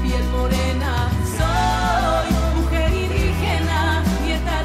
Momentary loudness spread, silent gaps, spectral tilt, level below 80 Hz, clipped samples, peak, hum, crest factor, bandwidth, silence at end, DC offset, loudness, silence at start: 3 LU; none; -5.5 dB/octave; -22 dBFS; under 0.1%; -8 dBFS; none; 10 dB; 15 kHz; 0 s; under 0.1%; -20 LUFS; 0 s